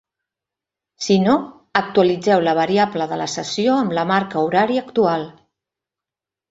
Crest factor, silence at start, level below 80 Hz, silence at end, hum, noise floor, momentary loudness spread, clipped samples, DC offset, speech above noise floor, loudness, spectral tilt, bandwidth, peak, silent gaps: 18 dB; 1 s; -60 dBFS; 1.2 s; none; -88 dBFS; 7 LU; under 0.1%; under 0.1%; 70 dB; -18 LUFS; -5 dB/octave; 8 kHz; -2 dBFS; none